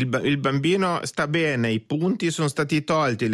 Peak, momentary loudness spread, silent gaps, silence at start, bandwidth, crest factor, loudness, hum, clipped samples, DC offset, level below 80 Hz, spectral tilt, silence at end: -10 dBFS; 3 LU; none; 0 s; 13 kHz; 12 dB; -23 LUFS; none; under 0.1%; under 0.1%; -58 dBFS; -5.5 dB/octave; 0 s